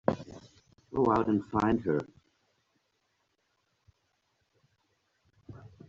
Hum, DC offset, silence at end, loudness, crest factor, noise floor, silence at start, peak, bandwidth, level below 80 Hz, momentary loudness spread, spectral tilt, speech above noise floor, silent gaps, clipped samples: none; under 0.1%; 0.2 s; -30 LUFS; 26 dB; -77 dBFS; 0.1 s; -8 dBFS; 7.6 kHz; -60 dBFS; 23 LU; -7 dB/octave; 49 dB; none; under 0.1%